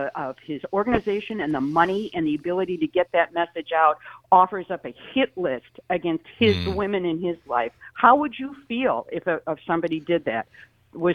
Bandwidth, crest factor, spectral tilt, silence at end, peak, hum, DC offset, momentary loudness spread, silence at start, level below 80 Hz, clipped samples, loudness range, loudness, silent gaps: 6.8 kHz; 22 dB; -7.5 dB/octave; 0 s; -2 dBFS; none; under 0.1%; 12 LU; 0 s; -54 dBFS; under 0.1%; 2 LU; -24 LUFS; none